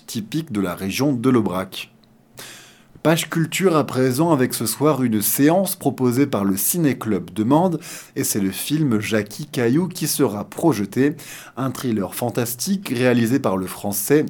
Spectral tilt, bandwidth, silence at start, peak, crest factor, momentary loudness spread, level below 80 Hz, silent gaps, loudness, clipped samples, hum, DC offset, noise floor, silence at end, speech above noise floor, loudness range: -5 dB/octave; 18 kHz; 0.1 s; -2 dBFS; 18 dB; 9 LU; -64 dBFS; none; -20 LUFS; under 0.1%; none; under 0.1%; -46 dBFS; 0 s; 26 dB; 3 LU